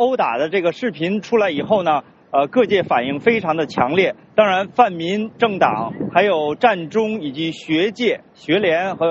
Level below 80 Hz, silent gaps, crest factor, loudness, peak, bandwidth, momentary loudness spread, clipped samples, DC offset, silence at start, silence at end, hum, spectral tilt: -60 dBFS; none; 18 dB; -18 LUFS; 0 dBFS; 8 kHz; 6 LU; under 0.1%; under 0.1%; 0 s; 0 s; none; -3.5 dB/octave